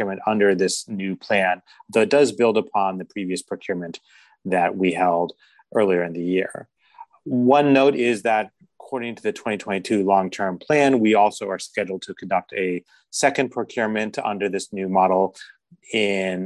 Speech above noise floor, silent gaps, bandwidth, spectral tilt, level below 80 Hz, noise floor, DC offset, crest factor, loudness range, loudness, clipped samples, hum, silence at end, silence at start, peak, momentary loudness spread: 26 dB; none; 12.5 kHz; -5 dB/octave; -64 dBFS; -47 dBFS; under 0.1%; 18 dB; 3 LU; -21 LUFS; under 0.1%; none; 0 s; 0 s; -4 dBFS; 13 LU